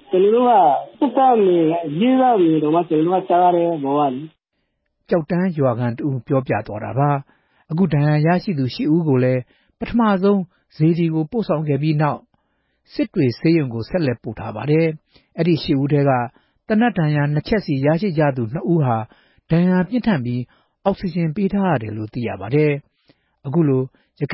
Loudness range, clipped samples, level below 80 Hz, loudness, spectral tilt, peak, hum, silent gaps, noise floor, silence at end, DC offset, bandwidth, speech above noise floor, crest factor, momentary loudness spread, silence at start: 5 LU; under 0.1%; -50 dBFS; -19 LUFS; -12.5 dB/octave; -4 dBFS; none; none; -72 dBFS; 0 s; under 0.1%; 5.8 kHz; 55 dB; 14 dB; 11 LU; 0.1 s